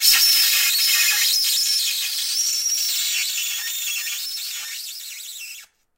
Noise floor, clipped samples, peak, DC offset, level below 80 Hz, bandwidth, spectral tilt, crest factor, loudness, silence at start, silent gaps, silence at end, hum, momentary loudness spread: -42 dBFS; under 0.1%; -2 dBFS; under 0.1%; -70 dBFS; 16 kHz; 6 dB/octave; 18 dB; -18 LUFS; 0 s; none; 0.3 s; none; 17 LU